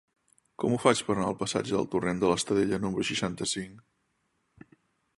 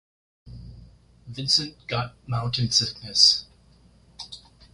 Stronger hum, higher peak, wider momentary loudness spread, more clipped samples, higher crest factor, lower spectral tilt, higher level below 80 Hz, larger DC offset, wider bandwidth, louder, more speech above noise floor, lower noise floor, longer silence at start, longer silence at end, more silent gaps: neither; about the same, -6 dBFS vs -4 dBFS; second, 7 LU vs 25 LU; neither; about the same, 24 dB vs 24 dB; first, -4.5 dB/octave vs -2.5 dB/octave; second, -58 dBFS vs -52 dBFS; neither; about the same, 11.5 kHz vs 11.5 kHz; second, -28 LUFS vs -21 LUFS; first, 47 dB vs 32 dB; first, -75 dBFS vs -56 dBFS; first, 0.6 s vs 0.45 s; first, 1.4 s vs 0.35 s; neither